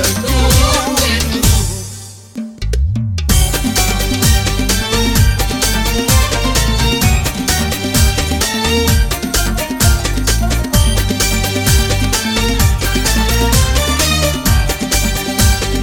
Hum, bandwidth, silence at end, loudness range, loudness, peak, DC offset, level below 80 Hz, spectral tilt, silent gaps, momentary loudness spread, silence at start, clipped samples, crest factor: none; 19.5 kHz; 0 s; 2 LU; -13 LUFS; 0 dBFS; under 0.1%; -16 dBFS; -3.5 dB/octave; none; 4 LU; 0 s; under 0.1%; 12 dB